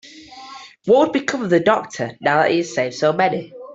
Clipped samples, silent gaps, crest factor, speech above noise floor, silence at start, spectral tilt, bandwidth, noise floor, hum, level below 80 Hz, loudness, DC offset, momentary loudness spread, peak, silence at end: under 0.1%; none; 16 dB; 21 dB; 0.05 s; -5 dB/octave; 8 kHz; -39 dBFS; none; -62 dBFS; -18 LUFS; under 0.1%; 20 LU; -4 dBFS; 0 s